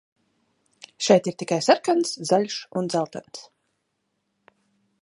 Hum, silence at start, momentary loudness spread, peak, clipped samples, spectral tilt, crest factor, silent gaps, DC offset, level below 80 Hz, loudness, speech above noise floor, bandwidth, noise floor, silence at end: none; 1 s; 15 LU; -2 dBFS; under 0.1%; -4.5 dB/octave; 24 dB; none; under 0.1%; -76 dBFS; -23 LUFS; 53 dB; 11.5 kHz; -76 dBFS; 1.6 s